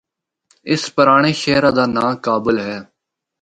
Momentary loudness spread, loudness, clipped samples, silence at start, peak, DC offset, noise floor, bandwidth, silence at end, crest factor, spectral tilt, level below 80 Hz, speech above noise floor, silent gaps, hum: 13 LU; -15 LUFS; under 0.1%; 0.65 s; 0 dBFS; under 0.1%; -61 dBFS; 10.5 kHz; 0.6 s; 18 dB; -5 dB/octave; -52 dBFS; 46 dB; none; none